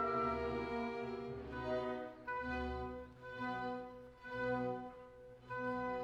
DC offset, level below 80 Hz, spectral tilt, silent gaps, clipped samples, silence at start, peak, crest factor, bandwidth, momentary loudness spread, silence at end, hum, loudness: under 0.1%; -58 dBFS; -7 dB/octave; none; under 0.1%; 0 s; -26 dBFS; 16 dB; 9.6 kHz; 13 LU; 0 s; none; -42 LUFS